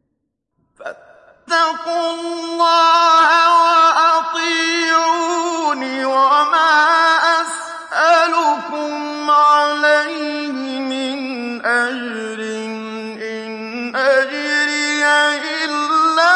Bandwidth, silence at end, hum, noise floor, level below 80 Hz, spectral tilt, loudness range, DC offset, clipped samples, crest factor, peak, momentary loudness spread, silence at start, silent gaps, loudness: 11.5 kHz; 0 s; none; -73 dBFS; -72 dBFS; -1.5 dB/octave; 7 LU; under 0.1%; under 0.1%; 14 dB; -2 dBFS; 14 LU; 0.8 s; none; -15 LUFS